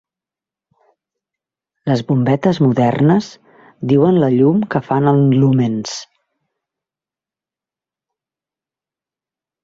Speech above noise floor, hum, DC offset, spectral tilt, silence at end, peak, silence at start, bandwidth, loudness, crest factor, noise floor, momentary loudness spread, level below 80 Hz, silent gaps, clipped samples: 75 dB; none; under 0.1%; -7.5 dB/octave; 3.6 s; -2 dBFS; 1.85 s; 7.8 kHz; -14 LUFS; 16 dB; -89 dBFS; 13 LU; -56 dBFS; none; under 0.1%